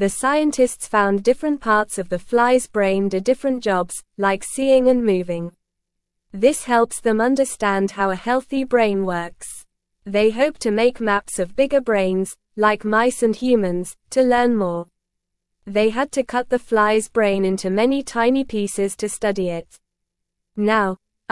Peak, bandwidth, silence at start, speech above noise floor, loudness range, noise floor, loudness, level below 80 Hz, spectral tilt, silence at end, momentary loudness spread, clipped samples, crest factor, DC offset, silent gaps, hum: -2 dBFS; 12 kHz; 0 s; 60 dB; 2 LU; -79 dBFS; -19 LUFS; -50 dBFS; -4.5 dB/octave; 0.35 s; 8 LU; under 0.1%; 16 dB; 0.2%; none; none